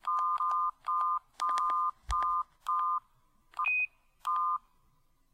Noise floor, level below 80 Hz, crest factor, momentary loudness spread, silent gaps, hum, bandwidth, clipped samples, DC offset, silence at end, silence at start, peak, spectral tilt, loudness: -68 dBFS; -54 dBFS; 18 dB; 6 LU; none; none; 15 kHz; under 0.1%; under 0.1%; 0.75 s; 0.05 s; -16 dBFS; -1.5 dB/octave; -32 LUFS